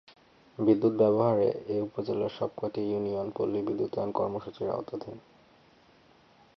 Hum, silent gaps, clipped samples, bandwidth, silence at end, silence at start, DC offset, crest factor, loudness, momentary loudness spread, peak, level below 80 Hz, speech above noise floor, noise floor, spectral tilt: none; none; under 0.1%; 6 kHz; 1.4 s; 0.6 s; under 0.1%; 18 dB; -29 LUFS; 12 LU; -12 dBFS; -66 dBFS; 31 dB; -60 dBFS; -9.5 dB/octave